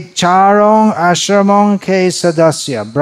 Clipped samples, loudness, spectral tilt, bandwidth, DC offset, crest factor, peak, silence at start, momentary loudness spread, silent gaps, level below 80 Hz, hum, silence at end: under 0.1%; -10 LUFS; -5 dB/octave; 13.5 kHz; under 0.1%; 10 dB; 0 dBFS; 0 s; 5 LU; none; -58 dBFS; none; 0 s